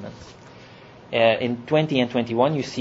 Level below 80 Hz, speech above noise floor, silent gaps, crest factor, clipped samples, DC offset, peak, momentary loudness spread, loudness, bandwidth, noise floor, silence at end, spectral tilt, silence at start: -60 dBFS; 24 dB; none; 20 dB; under 0.1%; under 0.1%; -4 dBFS; 10 LU; -22 LUFS; 8 kHz; -45 dBFS; 0 s; -6 dB/octave; 0 s